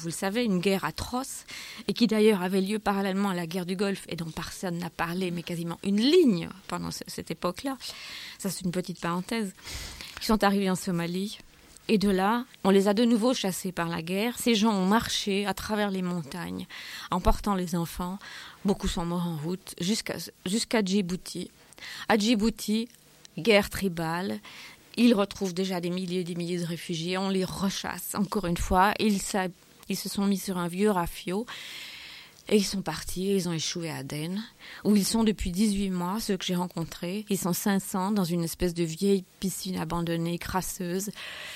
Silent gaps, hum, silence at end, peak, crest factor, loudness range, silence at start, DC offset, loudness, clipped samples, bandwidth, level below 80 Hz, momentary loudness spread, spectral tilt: none; none; 0 s; -8 dBFS; 20 dB; 4 LU; 0 s; under 0.1%; -28 LUFS; under 0.1%; 16.5 kHz; -46 dBFS; 13 LU; -5 dB/octave